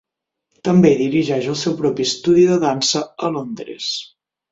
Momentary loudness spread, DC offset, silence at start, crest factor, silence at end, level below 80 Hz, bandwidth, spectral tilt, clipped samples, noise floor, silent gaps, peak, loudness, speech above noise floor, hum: 12 LU; under 0.1%; 0.65 s; 16 dB; 0.5 s; -56 dBFS; 7.8 kHz; -5 dB/octave; under 0.1%; -76 dBFS; none; -2 dBFS; -17 LUFS; 59 dB; none